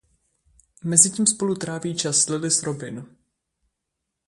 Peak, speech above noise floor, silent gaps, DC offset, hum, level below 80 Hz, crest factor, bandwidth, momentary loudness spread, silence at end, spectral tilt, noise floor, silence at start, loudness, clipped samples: 0 dBFS; 59 dB; none; under 0.1%; none; -64 dBFS; 26 dB; 11.5 kHz; 17 LU; 1.25 s; -3 dB/octave; -81 dBFS; 0.85 s; -20 LUFS; under 0.1%